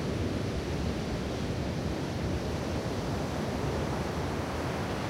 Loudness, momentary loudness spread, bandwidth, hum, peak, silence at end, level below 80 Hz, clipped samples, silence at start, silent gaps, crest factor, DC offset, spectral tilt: -33 LUFS; 1 LU; 16 kHz; none; -20 dBFS; 0 s; -42 dBFS; under 0.1%; 0 s; none; 12 dB; under 0.1%; -6 dB/octave